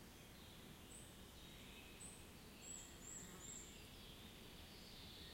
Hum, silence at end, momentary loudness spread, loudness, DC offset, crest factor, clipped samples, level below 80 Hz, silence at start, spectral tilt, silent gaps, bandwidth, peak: none; 0 s; 5 LU; -57 LUFS; under 0.1%; 14 dB; under 0.1%; -68 dBFS; 0 s; -2.5 dB/octave; none; 16.5 kHz; -44 dBFS